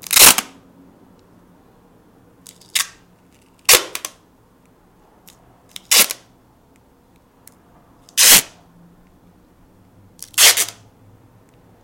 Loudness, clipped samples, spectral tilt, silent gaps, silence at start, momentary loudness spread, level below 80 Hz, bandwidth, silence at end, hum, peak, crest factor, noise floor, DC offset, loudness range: -12 LUFS; 0.1%; 1.5 dB/octave; none; 0.1 s; 21 LU; -54 dBFS; over 20 kHz; 1.15 s; none; 0 dBFS; 20 dB; -53 dBFS; under 0.1%; 6 LU